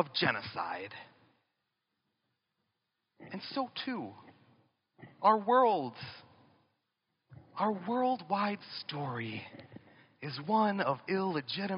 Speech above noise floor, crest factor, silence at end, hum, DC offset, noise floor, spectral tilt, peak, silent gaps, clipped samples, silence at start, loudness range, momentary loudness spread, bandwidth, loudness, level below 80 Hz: 51 dB; 24 dB; 0 s; none; under 0.1%; -84 dBFS; -3.5 dB/octave; -12 dBFS; none; under 0.1%; 0 s; 11 LU; 19 LU; 5.4 kHz; -33 LUFS; -82 dBFS